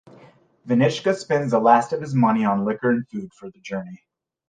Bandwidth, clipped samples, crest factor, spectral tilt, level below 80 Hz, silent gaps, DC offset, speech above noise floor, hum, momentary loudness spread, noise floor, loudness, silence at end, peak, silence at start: 9.4 kHz; under 0.1%; 18 dB; -7 dB/octave; -66 dBFS; none; under 0.1%; 31 dB; none; 17 LU; -52 dBFS; -21 LUFS; 0.55 s; -2 dBFS; 0.65 s